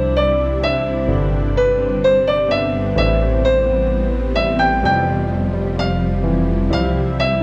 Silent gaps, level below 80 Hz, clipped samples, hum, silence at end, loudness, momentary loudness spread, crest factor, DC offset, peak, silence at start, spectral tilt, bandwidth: none; -22 dBFS; under 0.1%; none; 0 s; -17 LUFS; 4 LU; 14 dB; under 0.1%; -2 dBFS; 0 s; -8 dB/octave; 7.4 kHz